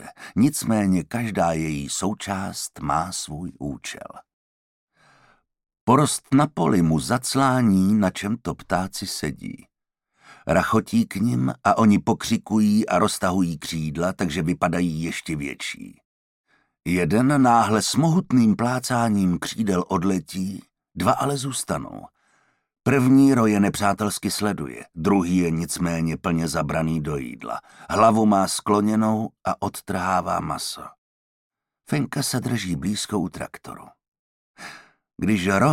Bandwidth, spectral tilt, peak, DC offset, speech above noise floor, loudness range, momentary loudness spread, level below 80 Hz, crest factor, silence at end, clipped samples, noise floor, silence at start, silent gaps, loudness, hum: 16.5 kHz; -5.5 dB/octave; -4 dBFS; under 0.1%; 53 dB; 7 LU; 14 LU; -52 dBFS; 18 dB; 0 s; under 0.1%; -74 dBFS; 0 s; 4.33-4.88 s, 5.81-5.87 s, 16.05-16.44 s, 30.98-31.50 s, 34.08-34.12 s, 34.19-34.54 s; -22 LUFS; none